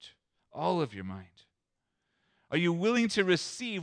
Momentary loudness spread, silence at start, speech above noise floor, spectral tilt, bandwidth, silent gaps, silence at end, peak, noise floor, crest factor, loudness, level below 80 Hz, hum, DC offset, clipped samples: 16 LU; 0 s; 54 dB; -5 dB/octave; 10.5 kHz; none; 0 s; -14 dBFS; -84 dBFS; 18 dB; -30 LUFS; -74 dBFS; none; under 0.1%; under 0.1%